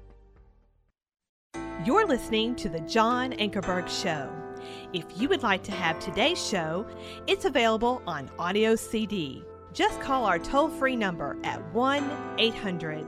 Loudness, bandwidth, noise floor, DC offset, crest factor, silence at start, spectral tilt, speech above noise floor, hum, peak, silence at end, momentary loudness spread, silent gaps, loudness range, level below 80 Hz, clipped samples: -27 LUFS; 15 kHz; -69 dBFS; under 0.1%; 18 dB; 0 s; -4 dB/octave; 42 dB; none; -10 dBFS; 0 s; 11 LU; 1.29-1.50 s; 2 LU; -52 dBFS; under 0.1%